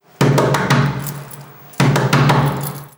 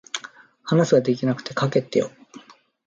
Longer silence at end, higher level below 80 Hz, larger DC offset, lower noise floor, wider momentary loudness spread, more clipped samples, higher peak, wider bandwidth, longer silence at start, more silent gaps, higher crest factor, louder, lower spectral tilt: second, 0.1 s vs 0.5 s; first, -44 dBFS vs -66 dBFS; neither; second, -37 dBFS vs -45 dBFS; first, 19 LU vs 15 LU; neither; first, -2 dBFS vs -6 dBFS; first, over 20 kHz vs 7.6 kHz; about the same, 0.2 s vs 0.15 s; neither; about the same, 16 dB vs 18 dB; first, -16 LUFS vs -22 LUFS; about the same, -6 dB/octave vs -6 dB/octave